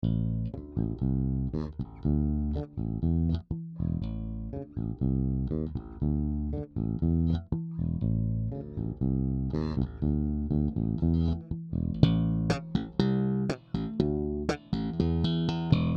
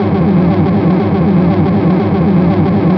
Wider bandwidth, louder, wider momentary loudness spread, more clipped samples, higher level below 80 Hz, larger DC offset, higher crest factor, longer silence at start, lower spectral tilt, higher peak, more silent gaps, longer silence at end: first, 8 kHz vs 5.4 kHz; second, -30 LUFS vs -11 LUFS; first, 8 LU vs 1 LU; neither; about the same, -38 dBFS vs -34 dBFS; neither; first, 24 dB vs 10 dB; about the same, 0 s vs 0 s; second, -9 dB/octave vs -11 dB/octave; second, -4 dBFS vs 0 dBFS; neither; about the same, 0 s vs 0 s